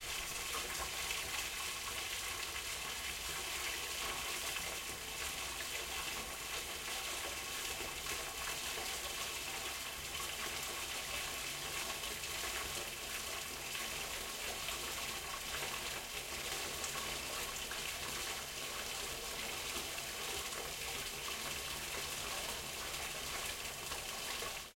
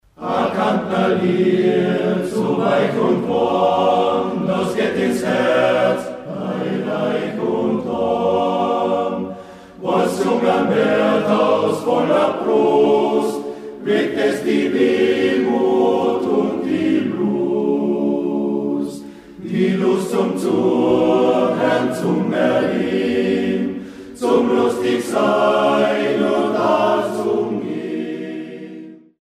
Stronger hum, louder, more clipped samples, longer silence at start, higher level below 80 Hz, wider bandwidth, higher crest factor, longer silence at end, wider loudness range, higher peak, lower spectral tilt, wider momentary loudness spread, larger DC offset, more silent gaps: neither; second, -40 LUFS vs -18 LUFS; neither; second, 0 s vs 0.2 s; about the same, -58 dBFS vs -58 dBFS; first, 16.5 kHz vs 14.5 kHz; about the same, 18 dB vs 14 dB; second, 0.05 s vs 0.25 s; about the same, 1 LU vs 3 LU; second, -24 dBFS vs -4 dBFS; second, -0.5 dB/octave vs -6.5 dB/octave; second, 2 LU vs 9 LU; neither; neither